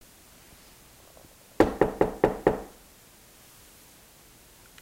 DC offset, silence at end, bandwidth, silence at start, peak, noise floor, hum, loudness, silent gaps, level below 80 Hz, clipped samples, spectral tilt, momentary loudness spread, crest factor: under 0.1%; 2.15 s; 16 kHz; 1.6 s; -6 dBFS; -54 dBFS; none; -26 LUFS; none; -48 dBFS; under 0.1%; -6.5 dB/octave; 27 LU; 26 dB